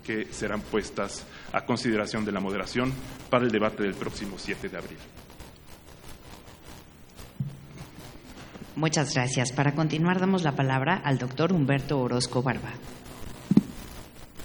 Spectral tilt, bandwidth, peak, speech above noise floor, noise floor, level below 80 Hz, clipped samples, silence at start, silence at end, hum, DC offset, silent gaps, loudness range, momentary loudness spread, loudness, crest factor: -5.5 dB/octave; over 20 kHz; -4 dBFS; 21 dB; -48 dBFS; -52 dBFS; under 0.1%; 0 s; 0 s; none; under 0.1%; none; 17 LU; 22 LU; -27 LUFS; 24 dB